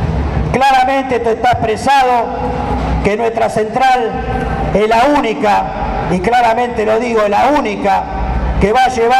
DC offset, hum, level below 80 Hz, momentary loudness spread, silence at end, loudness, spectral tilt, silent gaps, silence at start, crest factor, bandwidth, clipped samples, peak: under 0.1%; none; -24 dBFS; 7 LU; 0 s; -13 LUFS; -6 dB/octave; none; 0 s; 12 dB; 15 kHz; under 0.1%; 0 dBFS